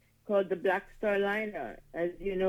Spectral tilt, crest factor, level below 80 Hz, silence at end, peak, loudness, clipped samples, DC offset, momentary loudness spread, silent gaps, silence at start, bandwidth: -7 dB/octave; 16 dB; -56 dBFS; 0 s; -16 dBFS; -32 LUFS; under 0.1%; under 0.1%; 9 LU; none; 0.25 s; 14 kHz